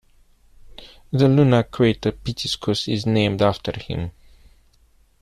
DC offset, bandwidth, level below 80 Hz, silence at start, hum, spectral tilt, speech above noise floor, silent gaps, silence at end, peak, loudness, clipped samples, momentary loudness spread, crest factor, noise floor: under 0.1%; 13.5 kHz; -46 dBFS; 0.7 s; none; -6.5 dB/octave; 37 dB; none; 1.1 s; -4 dBFS; -20 LUFS; under 0.1%; 13 LU; 18 dB; -57 dBFS